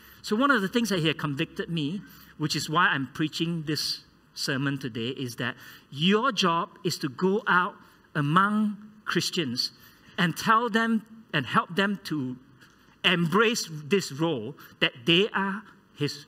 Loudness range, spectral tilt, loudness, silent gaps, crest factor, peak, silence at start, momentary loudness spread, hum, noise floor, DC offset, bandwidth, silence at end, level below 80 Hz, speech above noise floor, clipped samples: 3 LU; -4.5 dB/octave; -26 LUFS; none; 22 dB; -6 dBFS; 0.25 s; 11 LU; none; -56 dBFS; under 0.1%; 16 kHz; 0.05 s; -66 dBFS; 30 dB; under 0.1%